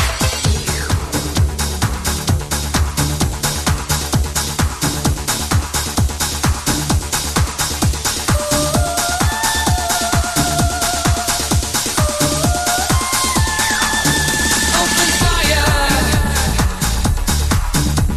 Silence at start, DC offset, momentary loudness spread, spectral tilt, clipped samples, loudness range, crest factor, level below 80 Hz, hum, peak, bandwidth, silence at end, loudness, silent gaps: 0 s; under 0.1%; 5 LU; -3 dB/octave; under 0.1%; 4 LU; 16 dB; -22 dBFS; none; 0 dBFS; 13.5 kHz; 0 s; -16 LUFS; none